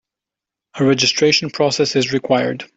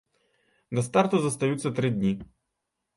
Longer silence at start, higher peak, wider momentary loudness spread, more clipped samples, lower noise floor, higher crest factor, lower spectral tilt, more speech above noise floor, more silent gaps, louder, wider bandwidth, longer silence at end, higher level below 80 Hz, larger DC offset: about the same, 0.75 s vs 0.7 s; first, -2 dBFS vs -6 dBFS; second, 5 LU vs 8 LU; neither; first, -86 dBFS vs -82 dBFS; second, 16 dB vs 22 dB; second, -4 dB/octave vs -6 dB/octave; first, 70 dB vs 57 dB; neither; first, -16 LUFS vs -26 LUFS; second, 8 kHz vs 11.5 kHz; second, 0.1 s vs 0.7 s; about the same, -60 dBFS vs -60 dBFS; neither